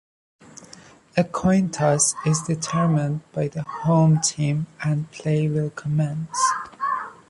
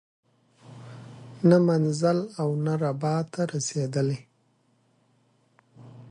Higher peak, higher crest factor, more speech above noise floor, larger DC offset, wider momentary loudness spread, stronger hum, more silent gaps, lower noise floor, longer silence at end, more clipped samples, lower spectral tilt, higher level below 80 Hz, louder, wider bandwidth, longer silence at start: first, -4 dBFS vs -8 dBFS; about the same, 18 dB vs 20 dB; second, 26 dB vs 43 dB; neither; second, 8 LU vs 24 LU; neither; neither; second, -48 dBFS vs -67 dBFS; about the same, 0.15 s vs 0.05 s; neither; about the same, -5.5 dB/octave vs -6.5 dB/octave; first, -54 dBFS vs -70 dBFS; first, -22 LUFS vs -25 LUFS; about the same, 11.5 kHz vs 10.5 kHz; about the same, 0.6 s vs 0.7 s